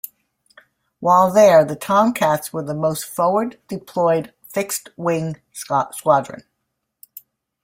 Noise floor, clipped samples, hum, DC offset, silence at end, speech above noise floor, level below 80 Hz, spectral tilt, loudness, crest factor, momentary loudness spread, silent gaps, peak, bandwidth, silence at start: -76 dBFS; under 0.1%; none; under 0.1%; 1.25 s; 58 dB; -62 dBFS; -5 dB/octave; -18 LUFS; 18 dB; 15 LU; none; -2 dBFS; 16.5 kHz; 1 s